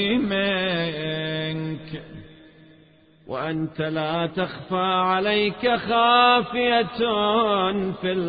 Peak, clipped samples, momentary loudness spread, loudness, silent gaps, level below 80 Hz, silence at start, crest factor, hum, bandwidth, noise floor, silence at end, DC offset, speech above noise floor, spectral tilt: -6 dBFS; under 0.1%; 12 LU; -22 LUFS; none; -56 dBFS; 0 s; 16 dB; none; 5 kHz; -54 dBFS; 0 s; under 0.1%; 33 dB; -10 dB/octave